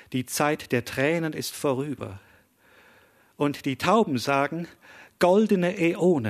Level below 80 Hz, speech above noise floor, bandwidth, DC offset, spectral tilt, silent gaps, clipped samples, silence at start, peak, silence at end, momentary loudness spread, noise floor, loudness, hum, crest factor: -64 dBFS; 34 dB; 14 kHz; under 0.1%; -5.5 dB/octave; none; under 0.1%; 0.1 s; -6 dBFS; 0 s; 10 LU; -58 dBFS; -25 LUFS; none; 18 dB